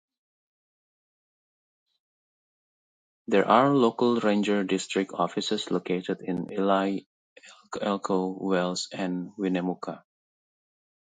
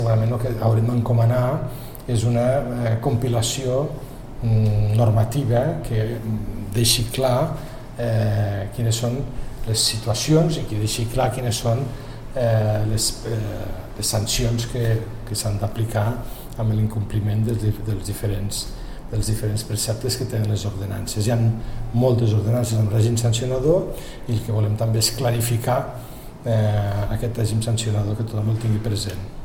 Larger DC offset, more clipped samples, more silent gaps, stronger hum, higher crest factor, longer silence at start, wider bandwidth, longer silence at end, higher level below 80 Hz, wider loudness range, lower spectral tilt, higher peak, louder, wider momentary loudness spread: second, under 0.1% vs 0.4%; neither; first, 7.06-7.36 s vs none; neither; first, 24 dB vs 16 dB; first, 3.3 s vs 0 s; second, 9.4 kHz vs 16.5 kHz; first, 1.15 s vs 0 s; second, -74 dBFS vs -34 dBFS; about the same, 5 LU vs 3 LU; about the same, -5.5 dB/octave vs -5.5 dB/octave; about the same, -6 dBFS vs -4 dBFS; second, -26 LUFS vs -22 LUFS; about the same, 11 LU vs 10 LU